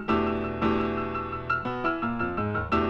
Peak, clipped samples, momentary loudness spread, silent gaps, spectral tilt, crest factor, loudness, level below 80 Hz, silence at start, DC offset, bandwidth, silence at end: -12 dBFS; under 0.1%; 4 LU; none; -8 dB/octave; 14 dB; -28 LUFS; -44 dBFS; 0 s; under 0.1%; 7.2 kHz; 0 s